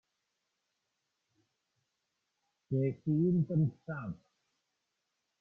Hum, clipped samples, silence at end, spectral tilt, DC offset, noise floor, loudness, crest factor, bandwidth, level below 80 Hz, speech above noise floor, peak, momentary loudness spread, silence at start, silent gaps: none; under 0.1%; 1.25 s; -12 dB/octave; under 0.1%; -84 dBFS; -33 LUFS; 16 dB; 2.8 kHz; -72 dBFS; 53 dB; -20 dBFS; 13 LU; 2.7 s; none